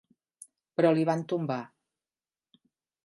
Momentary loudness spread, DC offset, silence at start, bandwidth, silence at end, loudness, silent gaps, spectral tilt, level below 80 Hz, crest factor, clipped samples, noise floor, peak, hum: 12 LU; under 0.1%; 0.8 s; 11.5 kHz; 1.4 s; -28 LUFS; none; -7.5 dB/octave; -82 dBFS; 22 dB; under 0.1%; under -90 dBFS; -10 dBFS; none